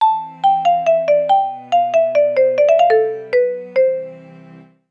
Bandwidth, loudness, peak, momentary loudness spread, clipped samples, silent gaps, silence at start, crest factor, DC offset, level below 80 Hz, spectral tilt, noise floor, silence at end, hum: 7.2 kHz; -15 LUFS; -4 dBFS; 5 LU; under 0.1%; none; 0 s; 12 dB; under 0.1%; -68 dBFS; -4.5 dB/octave; -42 dBFS; 0.3 s; none